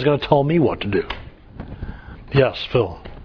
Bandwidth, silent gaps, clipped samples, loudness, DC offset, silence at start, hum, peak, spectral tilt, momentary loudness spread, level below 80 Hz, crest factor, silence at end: 5.4 kHz; none; under 0.1%; -20 LUFS; under 0.1%; 0 s; none; -2 dBFS; -9 dB/octave; 19 LU; -40 dBFS; 18 dB; 0 s